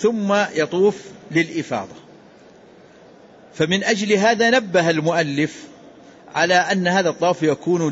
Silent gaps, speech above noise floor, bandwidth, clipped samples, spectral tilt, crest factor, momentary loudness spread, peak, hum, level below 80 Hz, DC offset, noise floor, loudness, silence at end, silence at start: none; 28 dB; 8 kHz; under 0.1%; -4.5 dB/octave; 14 dB; 10 LU; -6 dBFS; none; -64 dBFS; under 0.1%; -47 dBFS; -19 LUFS; 0 s; 0 s